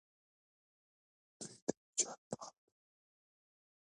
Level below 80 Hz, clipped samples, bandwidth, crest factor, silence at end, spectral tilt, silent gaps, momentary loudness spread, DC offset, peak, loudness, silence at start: -88 dBFS; under 0.1%; 11 kHz; 30 dB; 1.3 s; -2 dB/octave; 1.62-1.67 s, 1.77-1.93 s, 2.18-2.31 s; 15 LU; under 0.1%; -20 dBFS; -41 LUFS; 1.4 s